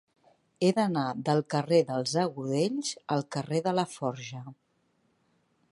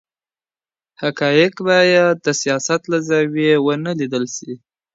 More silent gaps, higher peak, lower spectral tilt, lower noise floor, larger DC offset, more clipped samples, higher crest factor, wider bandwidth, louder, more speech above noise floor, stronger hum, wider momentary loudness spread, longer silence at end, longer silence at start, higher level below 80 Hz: neither; second, -10 dBFS vs 0 dBFS; about the same, -5.5 dB/octave vs -4.5 dB/octave; second, -72 dBFS vs under -90 dBFS; neither; neither; about the same, 20 dB vs 18 dB; first, 11.5 kHz vs 8 kHz; second, -29 LUFS vs -17 LUFS; second, 43 dB vs over 74 dB; neither; second, 9 LU vs 12 LU; first, 1.2 s vs 0.4 s; second, 0.6 s vs 1 s; second, -76 dBFS vs -66 dBFS